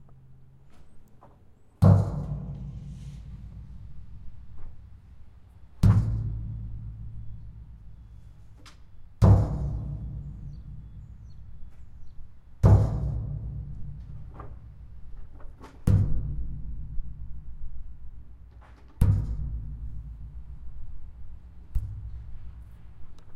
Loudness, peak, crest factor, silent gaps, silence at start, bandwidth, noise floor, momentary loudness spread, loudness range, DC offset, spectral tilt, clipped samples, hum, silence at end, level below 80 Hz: -27 LUFS; -6 dBFS; 24 dB; none; 0 s; 7 kHz; -54 dBFS; 27 LU; 11 LU; under 0.1%; -9.5 dB/octave; under 0.1%; none; 0 s; -36 dBFS